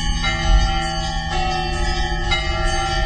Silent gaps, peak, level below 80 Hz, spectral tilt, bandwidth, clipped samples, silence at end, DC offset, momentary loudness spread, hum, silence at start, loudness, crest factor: none; -4 dBFS; -22 dBFS; -4 dB/octave; 9.4 kHz; under 0.1%; 0 s; under 0.1%; 4 LU; none; 0 s; -21 LUFS; 16 dB